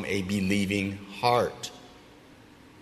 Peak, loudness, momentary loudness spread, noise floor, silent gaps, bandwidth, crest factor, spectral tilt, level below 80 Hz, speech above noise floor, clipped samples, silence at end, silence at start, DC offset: -8 dBFS; -27 LUFS; 15 LU; -52 dBFS; none; 13.5 kHz; 20 dB; -5 dB/octave; -60 dBFS; 25 dB; under 0.1%; 0 s; 0 s; under 0.1%